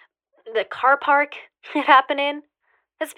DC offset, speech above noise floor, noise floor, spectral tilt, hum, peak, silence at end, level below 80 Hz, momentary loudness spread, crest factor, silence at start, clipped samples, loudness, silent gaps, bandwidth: under 0.1%; 48 dB; -68 dBFS; -2 dB/octave; none; -2 dBFS; 0.05 s; -80 dBFS; 16 LU; 20 dB; 0.45 s; under 0.1%; -19 LUFS; none; 14.5 kHz